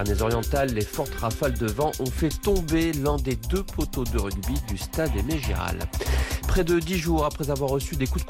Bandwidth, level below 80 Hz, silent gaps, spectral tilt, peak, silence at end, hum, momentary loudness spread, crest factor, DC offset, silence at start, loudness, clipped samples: 17 kHz; -30 dBFS; none; -5.5 dB/octave; -12 dBFS; 0 s; none; 5 LU; 12 dB; under 0.1%; 0 s; -26 LUFS; under 0.1%